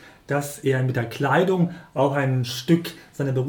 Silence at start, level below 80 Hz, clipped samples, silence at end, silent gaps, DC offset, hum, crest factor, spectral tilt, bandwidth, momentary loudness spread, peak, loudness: 0 s; -60 dBFS; under 0.1%; 0 s; none; under 0.1%; none; 18 dB; -6.5 dB/octave; 18.5 kHz; 7 LU; -6 dBFS; -23 LUFS